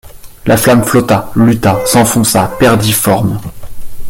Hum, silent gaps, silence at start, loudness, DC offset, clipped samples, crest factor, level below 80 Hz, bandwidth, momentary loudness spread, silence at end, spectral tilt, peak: none; none; 0.05 s; -10 LUFS; under 0.1%; under 0.1%; 10 dB; -32 dBFS; 17.5 kHz; 8 LU; 0 s; -5 dB/octave; 0 dBFS